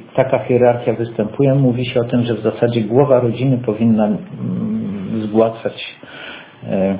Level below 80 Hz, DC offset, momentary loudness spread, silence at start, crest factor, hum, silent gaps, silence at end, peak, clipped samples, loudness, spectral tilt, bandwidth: -50 dBFS; under 0.1%; 13 LU; 0 s; 16 dB; none; none; 0 s; 0 dBFS; under 0.1%; -17 LUFS; -12 dB/octave; 4 kHz